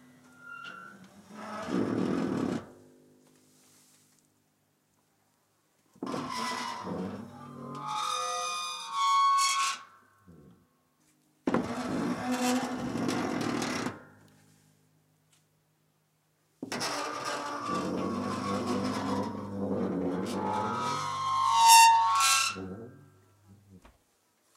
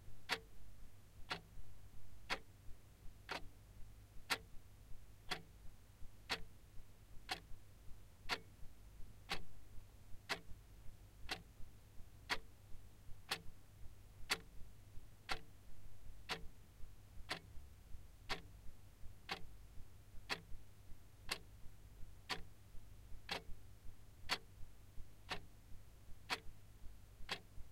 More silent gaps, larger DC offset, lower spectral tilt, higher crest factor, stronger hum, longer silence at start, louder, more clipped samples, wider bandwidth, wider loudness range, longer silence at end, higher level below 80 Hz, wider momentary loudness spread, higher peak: neither; neither; about the same, -3 dB/octave vs -2.5 dB/octave; about the same, 26 dB vs 26 dB; neither; first, 0.4 s vs 0 s; first, -29 LUFS vs -48 LUFS; neither; about the same, 16 kHz vs 16 kHz; first, 16 LU vs 3 LU; first, 0.8 s vs 0 s; second, -68 dBFS vs -58 dBFS; about the same, 20 LU vs 19 LU; first, -6 dBFS vs -22 dBFS